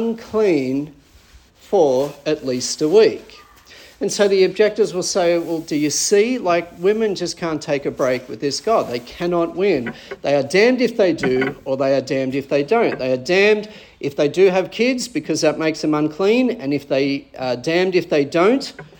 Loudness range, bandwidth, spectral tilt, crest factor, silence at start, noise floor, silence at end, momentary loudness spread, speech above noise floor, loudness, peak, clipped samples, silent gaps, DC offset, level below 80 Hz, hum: 2 LU; 18 kHz; -4.5 dB/octave; 16 dB; 0 s; -48 dBFS; 0.15 s; 8 LU; 30 dB; -18 LUFS; -2 dBFS; under 0.1%; none; under 0.1%; -56 dBFS; none